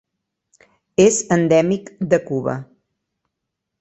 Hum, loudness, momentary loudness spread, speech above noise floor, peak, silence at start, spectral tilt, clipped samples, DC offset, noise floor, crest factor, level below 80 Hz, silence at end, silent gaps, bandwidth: none; -18 LUFS; 10 LU; 63 dB; -2 dBFS; 1 s; -5 dB/octave; under 0.1%; under 0.1%; -80 dBFS; 18 dB; -56 dBFS; 1.15 s; none; 8.4 kHz